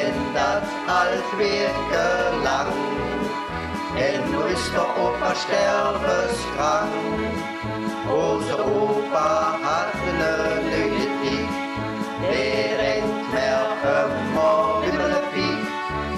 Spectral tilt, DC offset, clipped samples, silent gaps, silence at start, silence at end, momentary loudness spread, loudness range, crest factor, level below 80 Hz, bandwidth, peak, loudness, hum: -4.5 dB/octave; under 0.1%; under 0.1%; none; 0 s; 0 s; 6 LU; 2 LU; 12 dB; -44 dBFS; 14 kHz; -10 dBFS; -22 LUFS; none